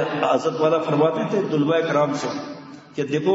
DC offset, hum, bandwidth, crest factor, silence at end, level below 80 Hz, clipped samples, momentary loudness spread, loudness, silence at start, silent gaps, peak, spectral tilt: under 0.1%; none; 8 kHz; 16 dB; 0 s; -70 dBFS; under 0.1%; 13 LU; -21 LUFS; 0 s; none; -6 dBFS; -6 dB/octave